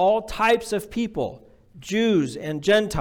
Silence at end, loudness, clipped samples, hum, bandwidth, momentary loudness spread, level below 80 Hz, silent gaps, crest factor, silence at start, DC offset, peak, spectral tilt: 0 s; -23 LUFS; under 0.1%; none; 19 kHz; 9 LU; -46 dBFS; none; 14 dB; 0 s; under 0.1%; -8 dBFS; -5 dB/octave